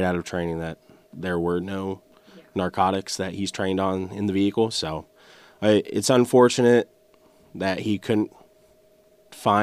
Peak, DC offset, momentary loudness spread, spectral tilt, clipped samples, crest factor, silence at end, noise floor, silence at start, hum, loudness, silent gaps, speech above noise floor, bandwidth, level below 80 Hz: -6 dBFS; under 0.1%; 15 LU; -5 dB/octave; under 0.1%; 18 dB; 0 s; -57 dBFS; 0 s; none; -23 LUFS; none; 35 dB; 15.5 kHz; -56 dBFS